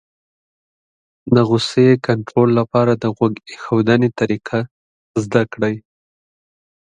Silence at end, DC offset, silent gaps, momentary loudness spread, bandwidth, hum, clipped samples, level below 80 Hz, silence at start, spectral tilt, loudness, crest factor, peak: 1.05 s; under 0.1%; 4.71-5.14 s; 11 LU; 10 kHz; none; under 0.1%; -54 dBFS; 1.25 s; -7 dB/octave; -17 LUFS; 18 dB; 0 dBFS